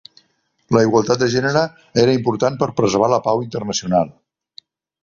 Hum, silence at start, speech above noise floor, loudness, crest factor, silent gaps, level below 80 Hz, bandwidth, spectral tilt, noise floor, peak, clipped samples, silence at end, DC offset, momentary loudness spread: none; 0.7 s; 47 dB; -18 LUFS; 18 dB; none; -52 dBFS; 7.6 kHz; -5.5 dB/octave; -64 dBFS; 0 dBFS; under 0.1%; 0.9 s; under 0.1%; 6 LU